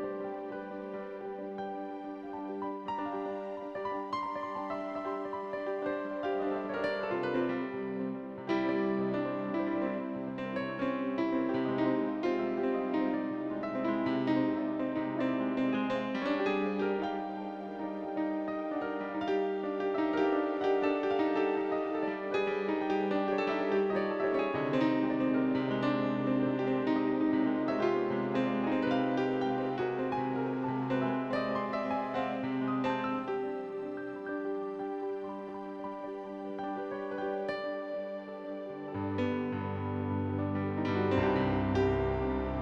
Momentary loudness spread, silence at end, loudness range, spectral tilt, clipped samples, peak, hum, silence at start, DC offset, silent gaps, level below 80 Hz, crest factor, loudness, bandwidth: 9 LU; 0 s; 7 LU; -8 dB/octave; under 0.1%; -18 dBFS; none; 0 s; under 0.1%; none; -58 dBFS; 16 dB; -33 LUFS; 7 kHz